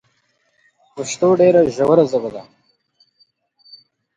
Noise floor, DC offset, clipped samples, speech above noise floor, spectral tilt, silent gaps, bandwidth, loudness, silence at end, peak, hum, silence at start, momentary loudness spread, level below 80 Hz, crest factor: -64 dBFS; under 0.1%; under 0.1%; 49 dB; -6 dB/octave; none; 9.4 kHz; -15 LUFS; 1.75 s; 0 dBFS; none; 0.95 s; 19 LU; -58 dBFS; 18 dB